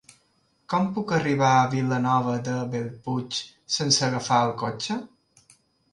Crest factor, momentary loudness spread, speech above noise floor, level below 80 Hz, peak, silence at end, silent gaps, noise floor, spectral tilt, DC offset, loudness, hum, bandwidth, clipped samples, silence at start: 20 dB; 11 LU; 43 dB; -64 dBFS; -6 dBFS; 0.85 s; none; -67 dBFS; -4.5 dB/octave; under 0.1%; -24 LUFS; none; 11.5 kHz; under 0.1%; 0.7 s